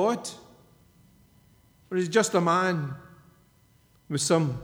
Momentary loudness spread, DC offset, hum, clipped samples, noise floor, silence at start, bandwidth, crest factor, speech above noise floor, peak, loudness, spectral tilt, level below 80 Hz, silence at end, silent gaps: 16 LU; under 0.1%; none; under 0.1%; -61 dBFS; 0 s; 19.5 kHz; 20 dB; 36 dB; -8 dBFS; -26 LUFS; -4.5 dB/octave; -66 dBFS; 0 s; none